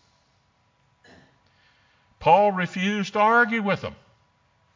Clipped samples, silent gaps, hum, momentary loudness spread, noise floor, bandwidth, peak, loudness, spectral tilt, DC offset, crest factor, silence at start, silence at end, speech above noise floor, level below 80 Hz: under 0.1%; none; none; 9 LU; -65 dBFS; 7.6 kHz; -6 dBFS; -21 LUFS; -5.5 dB/octave; under 0.1%; 20 dB; 2.2 s; 0.8 s; 44 dB; -60 dBFS